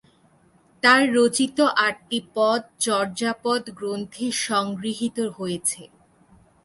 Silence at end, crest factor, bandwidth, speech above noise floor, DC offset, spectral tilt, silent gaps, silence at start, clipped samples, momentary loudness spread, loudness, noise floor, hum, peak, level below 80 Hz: 0.8 s; 20 dB; 12 kHz; 36 dB; under 0.1%; -3 dB/octave; none; 0.85 s; under 0.1%; 12 LU; -22 LUFS; -58 dBFS; none; -4 dBFS; -66 dBFS